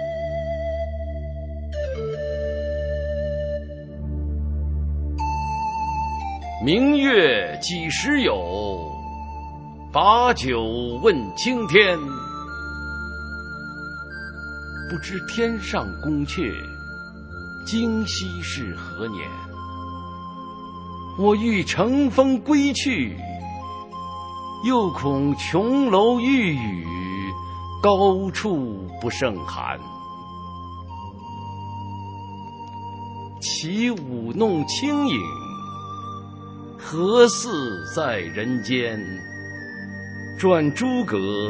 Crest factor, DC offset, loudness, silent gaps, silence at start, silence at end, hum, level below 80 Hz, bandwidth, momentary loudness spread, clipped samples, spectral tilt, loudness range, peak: 22 dB; under 0.1%; -23 LUFS; none; 0 s; 0 s; none; -36 dBFS; 8 kHz; 18 LU; under 0.1%; -5 dB/octave; 9 LU; 0 dBFS